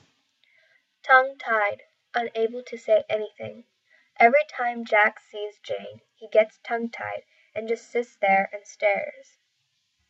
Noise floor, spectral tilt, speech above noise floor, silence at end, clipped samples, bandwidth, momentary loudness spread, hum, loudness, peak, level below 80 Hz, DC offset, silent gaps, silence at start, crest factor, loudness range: -73 dBFS; -4 dB/octave; 49 dB; 1 s; under 0.1%; 8 kHz; 18 LU; none; -24 LUFS; -4 dBFS; -82 dBFS; under 0.1%; none; 1.05 s; 22 dB; 4 LU